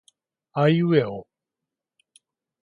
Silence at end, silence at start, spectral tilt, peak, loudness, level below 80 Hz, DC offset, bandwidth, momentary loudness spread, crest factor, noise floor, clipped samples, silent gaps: 1.4 s; 0.55 s; -8.5 dB/octave; -6 dBFS; -22 LUFS; -66 dBFS; under 0.1%; 10.5 kHz; 14 LU; 20 dB; -87 dBFS; under 0.1%; none